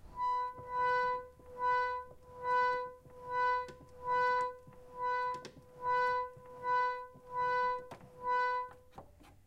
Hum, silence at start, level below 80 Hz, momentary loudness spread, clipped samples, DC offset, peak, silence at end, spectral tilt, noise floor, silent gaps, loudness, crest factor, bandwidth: none; 0.05 s; -66 dBFS; 15 LU; under 0.1%; under 0.1%; -22 dBFS; 0.15 s; -4 dB/octave; -56 dBFS; none; -35 LUFS; 14 dB; 9.8 kHz